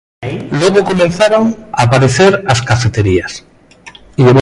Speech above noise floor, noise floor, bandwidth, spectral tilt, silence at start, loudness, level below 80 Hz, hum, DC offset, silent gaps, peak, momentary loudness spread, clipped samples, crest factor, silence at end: 27 dB; -38 dBFS; 11.5 kHz; -5.5 dB/octave; 0.2 s; -11 LUFS; -34 dBFS; none; under 0.1%; none; 0 dBFS; 14 LU; under 0.1%; 12 dB; 0 s